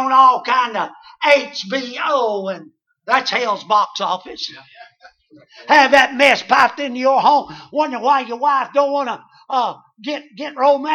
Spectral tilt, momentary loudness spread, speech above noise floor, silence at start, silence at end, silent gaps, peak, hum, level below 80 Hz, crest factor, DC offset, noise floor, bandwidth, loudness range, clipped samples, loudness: -3 dB/octave; 16 LU; 31 dB; 0 s; 0 s; none; 0 dBFS; none; -64 dBFS; 18 dB; under 0.1%; -48 dBFS; 12.5 kHz; 6 LU; under 0.1%; -16 LUFS